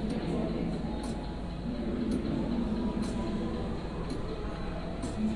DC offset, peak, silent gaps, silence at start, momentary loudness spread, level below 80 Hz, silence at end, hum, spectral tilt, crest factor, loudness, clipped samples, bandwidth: 0.1%; -20 dBFS; none; 0 s; 6 LU; -40 dBFS; 0 s; none; -7 dB/octave; 14 dB; -34 LUFS; under 0.1%; 11.5 kHz